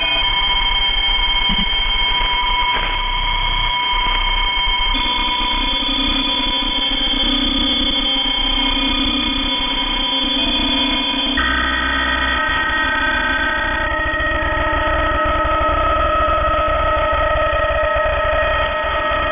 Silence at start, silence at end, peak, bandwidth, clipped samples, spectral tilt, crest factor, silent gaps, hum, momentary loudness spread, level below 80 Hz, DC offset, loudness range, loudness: 0 s; 0 s; -6 dBFS; 3.8 kHz; under 0.1%; -7.5 dB/octave; 12 dB; none; none; 3 LU; -26 dBFS; under 0.1%; 2 LU; -16 LUFS